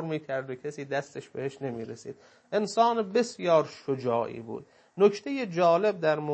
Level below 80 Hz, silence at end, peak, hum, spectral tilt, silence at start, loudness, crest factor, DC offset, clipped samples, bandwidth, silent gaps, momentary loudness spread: -76 dBFS; 0 s; -8 dBFS; none; -5.5 dB/octave; 0 s; -28 LUFS; 20 dB; under 0.1%; under 0.1%; 8.8 kHz; none; 16 LU